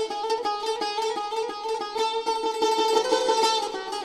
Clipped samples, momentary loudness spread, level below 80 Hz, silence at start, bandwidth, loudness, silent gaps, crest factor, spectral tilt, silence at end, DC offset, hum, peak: under 0.1%; 8 LU; -66 dBFS; 0 s; 14.5 kHz; -25 LUFS; none; 16 dB; -0.5 dB/octave; 0 s; under 0.1%; none; -10 dBFS